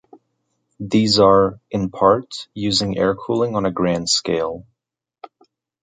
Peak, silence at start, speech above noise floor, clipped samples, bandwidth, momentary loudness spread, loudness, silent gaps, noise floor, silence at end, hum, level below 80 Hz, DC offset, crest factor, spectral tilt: -2 dBFS; 0.8 s; 66 dB; under 0.1%; 9.6 kHz; 12 LU; -18 LUFS; none; -84 dBFS; 1.2 s; none; -48 dBFS; under 0.1%; 18 dB; -4.5 dB/octave